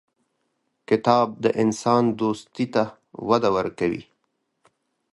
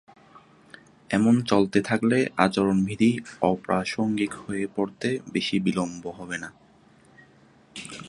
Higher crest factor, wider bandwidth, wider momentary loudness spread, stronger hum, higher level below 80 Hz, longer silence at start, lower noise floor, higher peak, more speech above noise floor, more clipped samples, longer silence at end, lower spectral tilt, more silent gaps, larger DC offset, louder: about the same, 22 dB vs 24 dB; about the same, 11.5 kHz vs 11.5 kHz; second, 8 LU vs 13 LU; neither; about the same, -60 dBFS vs -58 dBFS; second, 0.9 s vs 1.1 s; first, -74 dBFS vs -56 dBFS; about the same, -2 dBFS vs -2 dBFS; first, 53 dB vs 32 dB; neither; first, 1.1 s vs 0 s; about the same, -6 dB/octave vs -6 dB/octave; neither; neither; first, -22 LUFS vs -25 LUFS